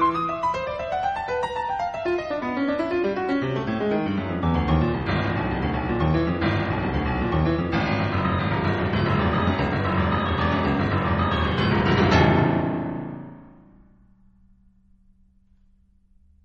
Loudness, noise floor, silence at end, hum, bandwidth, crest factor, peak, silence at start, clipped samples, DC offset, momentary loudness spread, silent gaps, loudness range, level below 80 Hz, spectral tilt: -23 LUFS; -58 dBFS; 2.95 s; none; 7.6 kHz; 18 dB; -6 dBFS; 0 s; under 0.1%; under 0.1%; 6 LU; none; 4 LU; -36 dBFS; -7.5 dB/octave